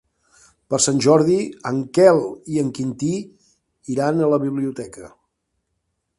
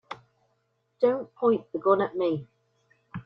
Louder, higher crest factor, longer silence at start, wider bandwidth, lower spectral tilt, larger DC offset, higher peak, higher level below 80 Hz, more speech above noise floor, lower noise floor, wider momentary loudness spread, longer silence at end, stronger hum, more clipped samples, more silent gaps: first, -19 LUFS vs -26 LUFS; about the same, 20 dB vs 20 dB; first, 0.7 s vs 0.1 s; first, 11.5 kHz vs 5.8 kHz; second, -5 dB/octave vs -9 dB/octave; neither; first, 0 dBFS vs -8 dBFS; first, -58 dBFS vs -68 dBFS; first, 55 dB vs 48 dB; about the same, -74 dBFS vs -73 dBFS; second, 13 LU vs 19 LU; first, 1.1 s vs 0.05 s; neither; neither; neither